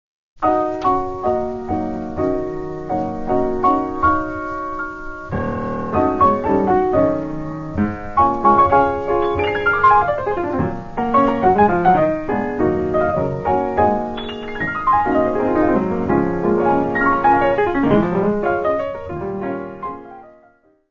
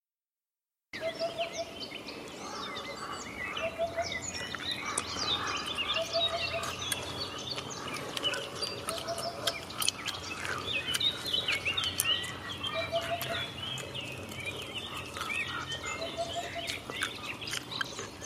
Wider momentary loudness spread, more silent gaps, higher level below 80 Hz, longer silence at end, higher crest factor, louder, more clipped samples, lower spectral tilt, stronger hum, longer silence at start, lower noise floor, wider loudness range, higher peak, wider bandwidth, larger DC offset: about the same, 12 LU vs 10 LU; neither; first, -38 dBFS vs -60 dBFS; first, 0.6 s vs 0 s; second, 18 dB vs 32 dB; first, -18 LUFS vs -33 LUFS; neither; first, -8.5 dB/octave vs -2 dB/octave; neither; second, 0.4 s vs 0.95 s; second, -54 dBFS vs under -90 dBFS; about the same, 5 LU vs 6 LU; first, 0 dBFS vs -4 dBFS; second, 7.2 kHz vs 16 kHz; neither